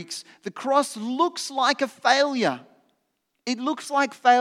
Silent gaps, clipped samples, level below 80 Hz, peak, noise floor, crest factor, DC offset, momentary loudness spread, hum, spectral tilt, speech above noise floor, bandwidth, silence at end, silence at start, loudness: none; under 0.1%; under -90 dBFS; -4 dBFS; -75 dBFS; 20 dB; under 0.1%; 15 LU; none; -2.5 dB/octave; 52 dB; 14.5 kHz; 0 s; 0 s; -24 LUFS